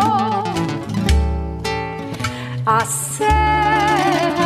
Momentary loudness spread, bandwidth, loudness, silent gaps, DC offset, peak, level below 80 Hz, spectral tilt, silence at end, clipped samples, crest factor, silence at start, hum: 9 LU; 15.5 kHz; -18 LUFS; none; under 0.1%; -4 dBFS; -26 dBFS; -4.5 dB/octave; 0 s; under 0.1%; 14 dB; 0 s; none